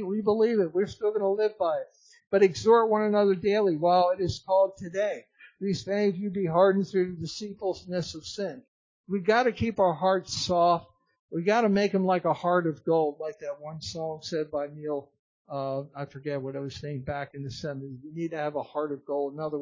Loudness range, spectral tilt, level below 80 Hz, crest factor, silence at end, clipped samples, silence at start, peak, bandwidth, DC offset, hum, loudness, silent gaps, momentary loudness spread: 10 LU; -6 dB/octave; -58 dBFS; 18 dB; 0 s; under 0.1%; 0 s; -8 dBFS; 7.6 kHz; under 0.1%; none; -27 LUFS; 8.68-9.04 s, 11.19-11.28 s, 15.19-15.45 s; 13 LU